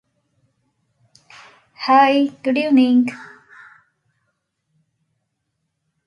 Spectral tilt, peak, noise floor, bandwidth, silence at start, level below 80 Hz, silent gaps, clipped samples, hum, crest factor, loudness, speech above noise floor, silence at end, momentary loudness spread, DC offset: -5 dB/octave; -4 dBFS; -74 dBFS; 7 kHz; 1.8 s; -72 dBFS; none; under 0.1%; none; 18 dB; -16 LUFS; 59 dB; 2.85 s; 13 LU; under 0.1%